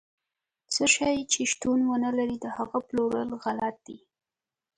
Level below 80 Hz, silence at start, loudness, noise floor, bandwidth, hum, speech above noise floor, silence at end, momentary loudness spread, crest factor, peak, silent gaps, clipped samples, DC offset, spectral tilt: -62 dBFS; 0.7 s; -27 LUFS; -87 dBFS; 11 kHz; none; 60 dB; 0.8 s; 9 LU; 20 dB; -8 dBFS; none; under 0.1%; under 0.1%; -2 dB/octave